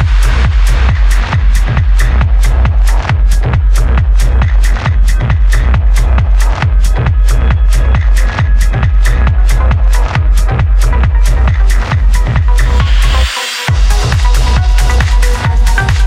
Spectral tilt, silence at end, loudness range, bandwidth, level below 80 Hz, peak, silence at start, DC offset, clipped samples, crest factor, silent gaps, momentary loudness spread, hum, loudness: -5 dB/octave; 0 s; 0 LU; 13 kHz; -8 dBFS; 0 dBFS; 0 s; under 0.1%; under 0.1%; 8 dB; none; 1 LU; none; -11 LUFS